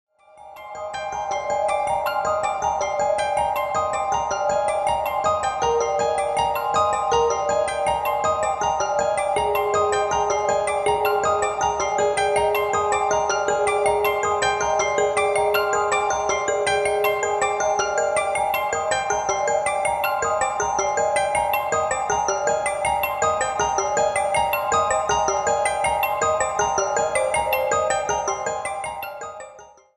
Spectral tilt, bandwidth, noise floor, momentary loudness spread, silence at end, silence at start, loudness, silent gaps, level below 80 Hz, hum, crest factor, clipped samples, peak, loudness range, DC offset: -2 dB/octave; 13 kHz; -45 dBFS; 3 LU; 0.3 s; 0.4 s; -21 LUFS; none; -48 dBFS; none; 16 dB; under 0.1%; -6 dBFS; 2 LU; under 0.1%